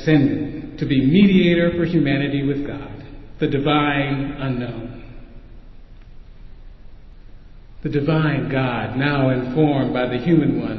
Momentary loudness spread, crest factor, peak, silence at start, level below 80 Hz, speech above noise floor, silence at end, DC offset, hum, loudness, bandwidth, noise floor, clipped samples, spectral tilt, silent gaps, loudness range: 15 LU; 16 dB; -4 dBFS; 0 s; -40 dBFS; 21 dB; 0 s; under 0.1%; none; -19 LUFS; 6 kHz; -40 dBFS; under 0.1%; -9 dB/octave; none; 13 LU